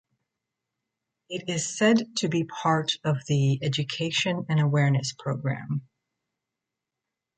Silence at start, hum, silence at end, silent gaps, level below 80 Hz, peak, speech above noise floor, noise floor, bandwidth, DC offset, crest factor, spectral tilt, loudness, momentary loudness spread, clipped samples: 1.3 s; none; 1.55 s; none; -66 dBFS; -8 dBFS; 61 dB; -87 dBFS; 9.4 kHz; under 0.1%; 18 dB; -5 dB/octave; -26 LUFS; 9 LU; under 0.1%